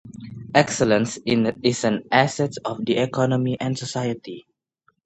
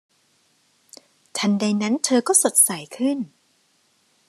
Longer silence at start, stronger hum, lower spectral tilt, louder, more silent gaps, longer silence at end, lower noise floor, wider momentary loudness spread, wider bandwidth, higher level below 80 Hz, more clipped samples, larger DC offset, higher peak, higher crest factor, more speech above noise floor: second, 0.05 s vs 1.35 s; neither; first, -5 dB/octave vs -3 dB/octave; second, -22 LUFS vs -19 LUFS; neither; second, 0.65 s vs 1 s; about the same, -66 dBFS vs -64 dBFS; about the same, 13 LU vs 13 LU; second, 9 kHz vs 14 kHz; first, -58 dBFS vs -78 dBFS; neither; neither; about the same, 0 dBFS vs -2 dBFS; about the same, 22 dB vs 20 dB; about the same, 45 dB vs 44 dB